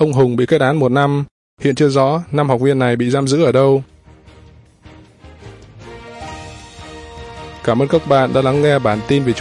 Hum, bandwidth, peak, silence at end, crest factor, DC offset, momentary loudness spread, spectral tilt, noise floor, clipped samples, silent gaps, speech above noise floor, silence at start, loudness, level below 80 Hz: none; 11 kHz; 0 dBFS; 0 s; 16 dB; under 0.1%; 20 LU; -7 dB/octave; -44 dBFS; under 0.1%; 1.31-1.57 s; 30 dB; 0 s; -15 LUFS; -46 dBFS